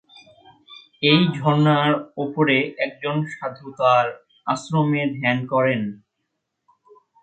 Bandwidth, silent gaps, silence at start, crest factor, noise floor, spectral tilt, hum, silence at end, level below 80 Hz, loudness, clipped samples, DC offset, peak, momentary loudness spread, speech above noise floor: 9 kHz; none; 0.7 s; 18 dB; -77 dBFS; -6.5 dB/octave; none; 1.25 s; -66 dBFS; -20 LUFS; under 0.1%; under 0.1%; -4 dBFS; 11 LU; 57 dB